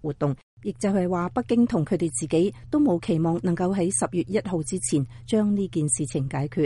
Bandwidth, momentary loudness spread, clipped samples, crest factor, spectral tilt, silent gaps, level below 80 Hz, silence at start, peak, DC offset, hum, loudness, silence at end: 11.5 kHz; 5 LU; under 0.1%; 14 dB; -6 dB/octave; 0.43-0.57 s; -52 dBFS; 0.05 s; -10 dBFS; under 0.1%; none; -25 LUFS; 0 s